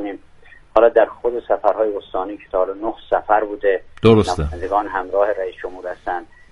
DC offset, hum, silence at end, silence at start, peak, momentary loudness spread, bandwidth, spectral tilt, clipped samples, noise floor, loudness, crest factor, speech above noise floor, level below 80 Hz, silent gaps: under 0.1%; none; 0.25 s; 0 s; 0 dBFS; 14 LU; 11.5 kHz; -7 dB/octave; under 0.1%; -45 dBFS; -19 LUFS; 18 dB; 26 dB; -38 dBFS; none